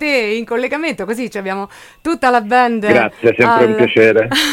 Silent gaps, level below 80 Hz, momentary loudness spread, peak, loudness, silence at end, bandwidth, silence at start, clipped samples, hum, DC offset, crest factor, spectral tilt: none; -50 dBFS; 11 LU; 0 dBFS; -14 LUFS; 0 s; 17 kHz; 0 s; under 0.1%; none; under 0.1%; 14 dB; -4.5 dB/octave